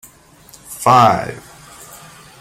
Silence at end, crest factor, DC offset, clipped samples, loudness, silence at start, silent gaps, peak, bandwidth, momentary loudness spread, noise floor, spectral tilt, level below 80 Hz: 1 s; 18 dB; under 0.1%; under 0.1%; -13 LUFS; 0.7 s; none; 0 dBFS; 16.5 kHz; 26 LU; -45 dBFS; -5 dB/octave; -52 dBFS